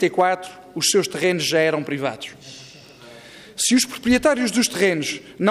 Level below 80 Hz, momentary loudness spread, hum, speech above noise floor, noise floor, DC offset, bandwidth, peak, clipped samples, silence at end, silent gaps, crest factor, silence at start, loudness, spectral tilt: -54 dBFS; 20 LU; none; 23 dB; -44 dBFS; under 0.1%; 15.5 kHz; -6 dBFS; under 0.1%; 0 s; none; 16 dB; 0 s; -20 LUFS; -3 dB/octave